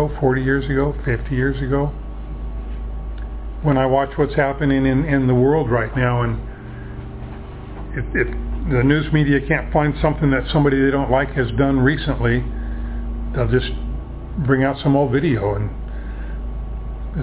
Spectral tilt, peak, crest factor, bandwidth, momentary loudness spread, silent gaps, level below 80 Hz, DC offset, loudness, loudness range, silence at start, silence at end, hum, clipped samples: -11.5 dB/octave; -2 dBFS; 16 dB; 4 kHz; 14 LU; none; -28 dBFS; under 0.1%; -19 LUFS; 5 LU; 0 s; 0 s; none; under 0.1%